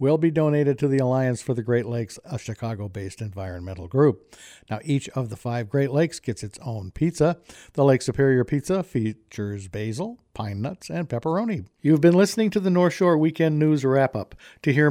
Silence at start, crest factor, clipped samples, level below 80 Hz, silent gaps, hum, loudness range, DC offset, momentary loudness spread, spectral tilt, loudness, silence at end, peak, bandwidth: 0 s; 18 dB; under 0.1%; -54 dBFS; none; none; 7 LU; under 0.1%; 13 LU; -7 dB/octave; -23 LUFS; 0 s; -6 dBFS; 15.5 kHz